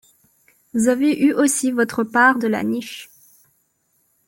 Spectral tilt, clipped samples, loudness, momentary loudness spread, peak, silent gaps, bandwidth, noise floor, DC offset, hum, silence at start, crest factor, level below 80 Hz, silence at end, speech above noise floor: -3.5 dB/octave; under 0.1%; -18 LUFS; 12 LU; -2 dBFS; none; 17 kHz; -66 dBFS; under 0.1%; none; 0.75 s; 18 dB; -64 dBFS; 1.25 s; 48 dB